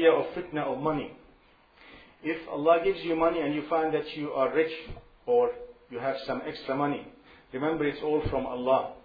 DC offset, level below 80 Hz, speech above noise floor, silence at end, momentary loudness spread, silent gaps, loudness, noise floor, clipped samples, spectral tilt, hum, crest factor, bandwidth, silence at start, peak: under 0.1%; -52 dBFS; 32 dB; 0.05 s; 14 LU; none; -29 LUFS; -60 dBFS; under 0.1%; -8.5 dB/octave; none; 20 dB; 5 kHz; 0 s; -8 dBFS